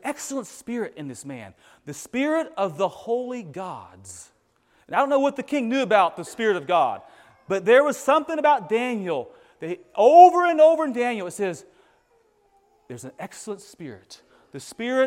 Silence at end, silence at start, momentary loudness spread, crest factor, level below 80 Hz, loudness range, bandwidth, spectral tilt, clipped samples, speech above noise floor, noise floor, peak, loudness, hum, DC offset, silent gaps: 0 s; 0.05 s; 23 LU; 22 dB; -72 dBFS; 13 LU; 15 kHz; -4.5 dB/octave; under 0.1%; 42 dB; -64 dBFS; 0 dBFS; -21 LUFS; none; under 0.1%; none